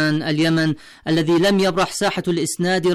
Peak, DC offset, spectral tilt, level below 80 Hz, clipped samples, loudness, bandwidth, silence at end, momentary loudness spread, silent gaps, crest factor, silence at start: -10 dBFS; under 0.1%; -5 dB/octave; -50 dBFS; under 0.1%; -19 LUFS; 15 kHz; 0 s; 6 LU; none; 8 dB; 0 s